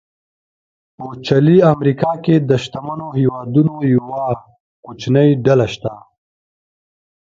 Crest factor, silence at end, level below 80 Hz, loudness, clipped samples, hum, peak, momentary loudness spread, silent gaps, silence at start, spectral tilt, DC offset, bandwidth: 16 dB; 1.4 s; -52 dBFS; -15 LUFS; under 0.1%; none; 0 dBFS; 15 LU; 4.60-4.83 s; 1 s; -8 dB/octave; under 0.1%; 7.6 kHz